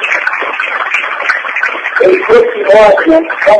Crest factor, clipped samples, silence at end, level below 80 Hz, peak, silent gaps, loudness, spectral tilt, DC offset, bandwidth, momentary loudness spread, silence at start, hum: 8 dB; 0.4%; 0 s; -44 dBFS; 0 dBFS; none; -9 LUFS; -4 dB/octave; under 0.1%; 10 kHz; 8 LU; 0 s; none